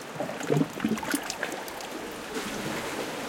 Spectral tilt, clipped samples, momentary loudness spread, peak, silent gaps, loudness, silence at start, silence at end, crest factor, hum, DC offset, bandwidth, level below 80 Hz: -4.5 dB/octave; under 0.1%; 9 LU; -12 dBFS; none; -31 LUFS; 0 s; 0 s; 20 dB; none; under 0.1%; 17 kHz; -60 dBFS